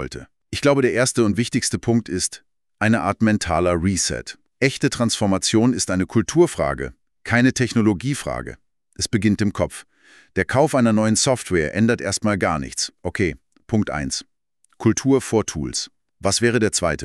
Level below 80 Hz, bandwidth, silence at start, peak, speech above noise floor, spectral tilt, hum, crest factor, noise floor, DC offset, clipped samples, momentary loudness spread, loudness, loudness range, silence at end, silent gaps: -44 dBFS; 13 kHz; 0 s; -2 dBFS; 34 dB; -4.5 dB/octave; none; 18 dB; -53 dBFS; under 0.1%; under 0.1%; 10 LU; -20 LUFS; 3 LU; 0 s; none